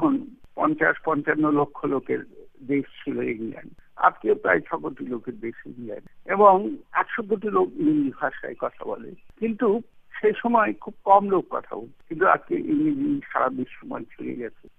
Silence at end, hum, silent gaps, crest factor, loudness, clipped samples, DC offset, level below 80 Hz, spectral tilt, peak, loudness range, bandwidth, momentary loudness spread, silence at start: 0.25 s; none; none; 22 dB; -24 LUFS; under 0.1%; under 0.1%; -60 dBFS; -9 dB/octave; -4 dBFS; 3 LU; 3.8 kHz; 17 LU; 0 s